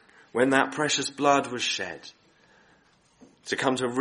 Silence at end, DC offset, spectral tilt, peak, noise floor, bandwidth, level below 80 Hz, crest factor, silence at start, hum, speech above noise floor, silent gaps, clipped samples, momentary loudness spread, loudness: 0 s; under 0.1%; -3 dB/octave; -4 dBFS; -62 dBFS; 11.5 kHz; -70 dBFS; 24 dB; 0.35 s; none; 37 dB; none; under 0.1%; 12 LU; -25 LUFS